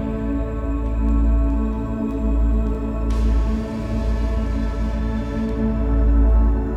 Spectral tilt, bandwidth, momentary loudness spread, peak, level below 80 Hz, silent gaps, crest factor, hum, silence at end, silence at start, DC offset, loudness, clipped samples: -9 dB/octave; 5.6 kHz; 6 LU; -6 dBFS; -20 dBFS; none; 12 dB; none; 0 s; 0 s; under 0.1%; -22 LUFS; under 0.1%